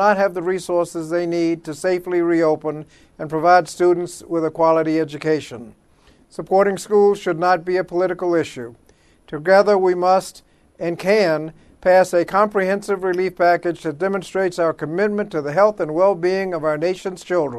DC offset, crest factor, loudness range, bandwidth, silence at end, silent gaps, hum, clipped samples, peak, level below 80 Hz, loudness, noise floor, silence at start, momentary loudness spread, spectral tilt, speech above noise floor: under 0.1%; 18 dB; 2 LU; 13 kHz; 0 s; none; none; under 0.1%; 0 dBFS; -56 dBFS; -19 LUFS; -53 dBFS; 0 s; 12 LU; -6 dB/octave; 35 dB